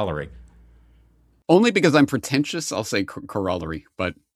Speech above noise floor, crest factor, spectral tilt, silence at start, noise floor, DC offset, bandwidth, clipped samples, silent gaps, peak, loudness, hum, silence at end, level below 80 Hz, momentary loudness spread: 36 dB; 20 dB; -5 dB/octave; 0 s; -58 dBFS; under 0.1%; 14 kHz; under 0.1%; none; -2 dBFS; -21 LUFS; none; 0.25 s; -52 dBFS; 15 LU